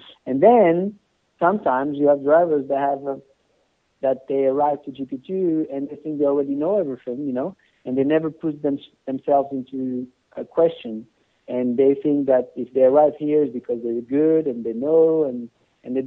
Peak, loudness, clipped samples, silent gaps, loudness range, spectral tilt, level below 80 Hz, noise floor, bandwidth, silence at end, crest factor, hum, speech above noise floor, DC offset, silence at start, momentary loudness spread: -2 dBFS; -21 LUFS; under 0.1%; none; 5 LU; -10 dB/octave; -66 dBFS; -66 dBFS; 4 kHz; 0 s; 18 dB; none; 46 dB; under 0.1%; 0.25 s; 14 LU